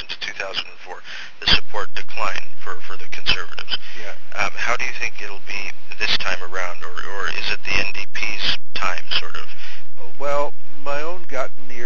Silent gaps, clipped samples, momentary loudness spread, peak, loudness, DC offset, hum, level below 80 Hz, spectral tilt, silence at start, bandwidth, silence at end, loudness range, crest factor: none; under 0.1%; 14 LU; 0 dBFS; -24 LUFS; 30%; none; -42 dBFS; -3 dB/octave; 0 s; 7.8 kHz; 0 s; 2 LU; 18 dB